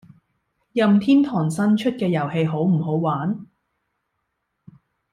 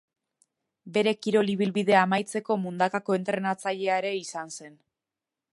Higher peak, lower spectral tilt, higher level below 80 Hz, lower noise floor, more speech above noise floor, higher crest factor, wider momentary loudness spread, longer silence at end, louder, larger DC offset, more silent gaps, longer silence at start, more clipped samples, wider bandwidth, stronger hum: about the same, -6 dBFS vs -6 dBFS; first, -7.5 dB/octave vs -5 dB/octave; first, -64 dBFS vs -76 dBFS; second, -76 dBFS vs -89 dBFS; second, 56 dB vs 63 dB; second, 16 dB vs 22 dB; about the same, 9 LU vs 11 LU; first, 1.7 s vs 0.85 s; first, -20 LUFS vs -26 LUFS; neither; neither; about the same, 0.75 s vs 0.85 s; neither; about the same, 11.5 kHz vs 11.5 kHz; neither